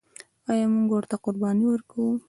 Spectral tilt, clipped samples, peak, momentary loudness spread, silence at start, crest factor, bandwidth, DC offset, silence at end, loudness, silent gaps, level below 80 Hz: -7.5 dB/octave; under 0.1%; -12 dBFS; 6 LU; 0.5 s; 14 dB; 11.5 kHz; under 0.1%; 0.1 s; -25 LUFS; none; -68 dBFS